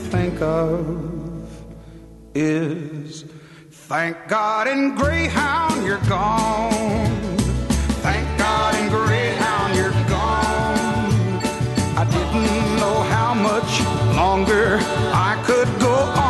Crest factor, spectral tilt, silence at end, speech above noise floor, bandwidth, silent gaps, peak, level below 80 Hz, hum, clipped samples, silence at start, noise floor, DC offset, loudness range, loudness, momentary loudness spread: 14 dB; -5.5 dB/octave; 0 s; 23 dB; 12.5 kHz; none; -4 dBFS; -32 dBFS; none; under 0.1%; 0 s; -44 dBFS; under 0.1%; 6 LU; -19 LUFS; 8 LU